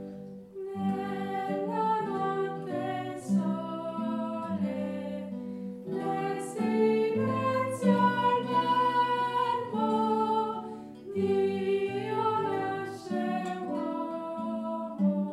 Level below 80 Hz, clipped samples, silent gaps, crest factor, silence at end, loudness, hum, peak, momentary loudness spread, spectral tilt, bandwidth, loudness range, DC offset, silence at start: -74 dBFS; under 0.1%; none; 18 dB; 0 s; -30 LUFS; none; -12 dBFS; 11 LU; -7 dB/octave; 12.5 kHz; 6 LU; under 0.1%; 0 s